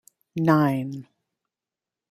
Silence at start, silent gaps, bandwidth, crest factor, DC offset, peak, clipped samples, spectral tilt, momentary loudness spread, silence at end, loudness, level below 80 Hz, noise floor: 0.35 s; none; 15 kHz; 22 dB; under 0.1%; -4 dBFS; under 0.1%; -8.5 dB/octave; 17 LU; 1.1 s; -22 LUFS; -68 dBFS; -90 dBFS